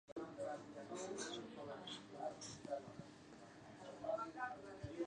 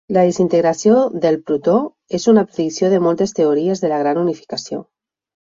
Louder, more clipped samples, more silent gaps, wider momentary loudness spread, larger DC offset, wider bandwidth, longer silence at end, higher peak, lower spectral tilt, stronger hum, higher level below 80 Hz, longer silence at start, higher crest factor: second, -50 LUFS vs -16 LUFS; neither; first, 0.12-0.16 s vs none; about the same, 13 LU vs 11 LU; neither; first, 10 kHz vs 7.8 kHz; second, 0 s vs 0.65 s; second, -32 dBFS vs -2 dBFS; second, -4 dB/octave vs -6 dB/octave; neither; second, -76 dBFS vs -60 dBFS; about the same, 0.1 s vs 0.1 s; about the same, 18 dB vs 14 dB